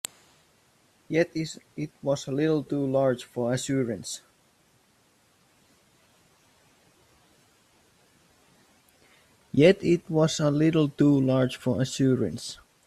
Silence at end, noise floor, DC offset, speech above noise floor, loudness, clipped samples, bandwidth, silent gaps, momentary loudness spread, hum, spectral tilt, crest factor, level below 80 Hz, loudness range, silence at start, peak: 0.3 s; -64 dBFS; under 0.1%; 40 dB; -25 LUFS; under 0.1%; 14.5 kHz; none; 15 LU; none; -6 dB/octave; 20 dB; -64 dBFS; 11 LU; 1.1 s; -8 dBFS